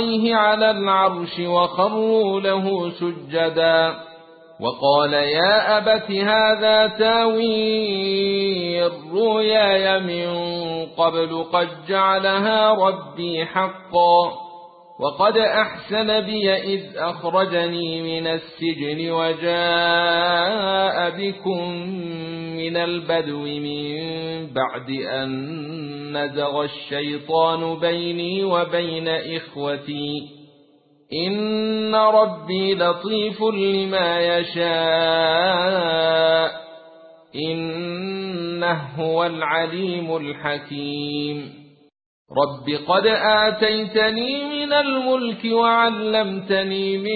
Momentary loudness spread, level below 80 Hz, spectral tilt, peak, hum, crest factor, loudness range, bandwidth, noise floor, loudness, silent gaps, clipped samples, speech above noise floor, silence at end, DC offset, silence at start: 11 LU; -60 dBFS; -10 dB/octave; -4 dBFS; none; 18 dB; 7 LU; 4.8 kHz; -55 dBFS; -20 LUFS; 42.06-42.25 s; under 0.1%; 35 dB; 0 s; under 0.1%; 0 s